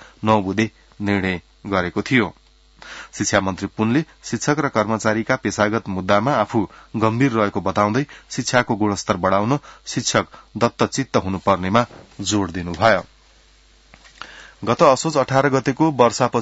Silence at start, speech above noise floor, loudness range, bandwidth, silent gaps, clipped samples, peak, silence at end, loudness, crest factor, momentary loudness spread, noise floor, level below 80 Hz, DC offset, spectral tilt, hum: 0.2 s; 33 dB; 2 LU; 8 kHz; none; under 0.1%; 0 dBFS; 0 s; -20 LUFS; 20 dB; 11 LU; -52 dBFS; -52 dBFS; under 0.1%; -5 dB/octave; none